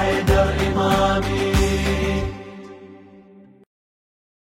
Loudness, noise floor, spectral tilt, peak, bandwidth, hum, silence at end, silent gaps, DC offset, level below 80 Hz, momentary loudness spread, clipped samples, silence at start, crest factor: -20 LUFS; -47 dBFS; -5.5 dB/octave; -4 dBFS; 16.5 kHz; none; 1.45 s; none; under 0.1%; -28 dBFS; 19 LU; under 0.1%; 0 s; 18 dB